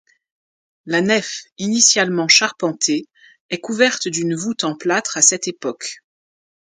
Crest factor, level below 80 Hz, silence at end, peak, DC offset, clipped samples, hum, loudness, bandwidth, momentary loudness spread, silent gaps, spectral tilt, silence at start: 20 dB; -68 dBFS; 0.8 s; 0 dBFS; under 0.1%; under 0.1%; none; -17 LUFS; 16 kHz; 14 LU; 1.52-1.56 s, 3.40-3.49 s; -2 dB/octave; 0.85 s